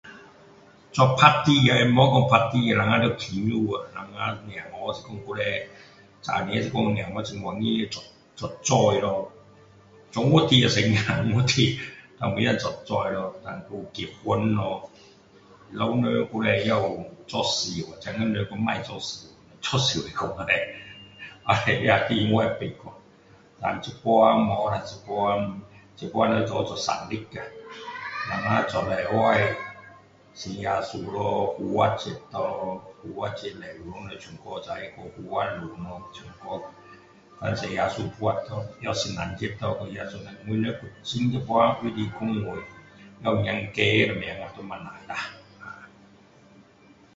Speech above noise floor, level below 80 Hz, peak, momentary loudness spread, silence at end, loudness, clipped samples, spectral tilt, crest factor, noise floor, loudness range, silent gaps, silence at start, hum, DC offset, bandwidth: 30 dB; -54 dBFS; 0 dBFS; 18 LU; 1.3 s; -25 LUFS; under 0.1%; -5 dB/octave; 26 dB; -55 dBFS; 9 LU; none; 0.05 s; none; under 0.1%; 8 kHz